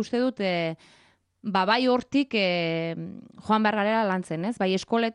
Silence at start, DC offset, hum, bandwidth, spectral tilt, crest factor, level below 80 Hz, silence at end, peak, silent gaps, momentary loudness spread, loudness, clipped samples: 0 s; under 0.1%; none; 11 kHz; -6 dB/octave; 18 dB; -68 dBFS; 0 s; -8 dBFS; none; 13 LU; -25 LUFS; under 0.1%